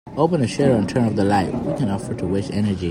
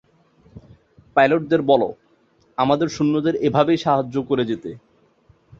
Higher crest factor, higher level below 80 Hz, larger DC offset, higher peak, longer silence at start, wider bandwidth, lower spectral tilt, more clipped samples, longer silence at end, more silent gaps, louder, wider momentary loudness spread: about the same, 16 dB vs 20 dB; first, -46 dBFS vs -56 dBFS; neither; about the same, -4 dBFS vs -2 dBFS; second, 0.05 s vs 0.55 s; first, 15 kHz vs 7.6 kHz; about the same, -7 dB/octave vs -6.5 dB/octave; neither; second, 0 s vs 0.8 s; neither; about the same, -20 LUFS vs -20 LUFS; second, 6 LU vs 9 LU